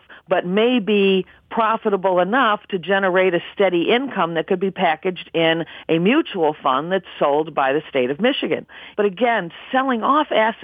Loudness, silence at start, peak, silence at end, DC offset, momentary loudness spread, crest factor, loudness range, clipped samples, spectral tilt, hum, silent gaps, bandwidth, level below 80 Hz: -19 LUFS; 0.1 s; -4 dBFS; 0 s; under 0.1%; 6 LU; 16 dB; 2 LU; under 0.1%; -8 dB/octave; none; none; 4.9 kHz; -64 dBFS